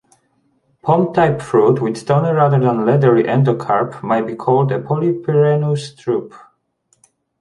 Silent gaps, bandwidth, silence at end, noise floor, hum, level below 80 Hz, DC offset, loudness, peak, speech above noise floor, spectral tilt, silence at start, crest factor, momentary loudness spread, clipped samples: none; 11 kHz; 1.05 s; -62 dBFS; none; -54 dBFS; under 0.1%; -16 LUFS; -2 dBFS; 48 dB; -8.5 dB/octave; 0.85 s; 14 dB; 8 LU; under 0.1%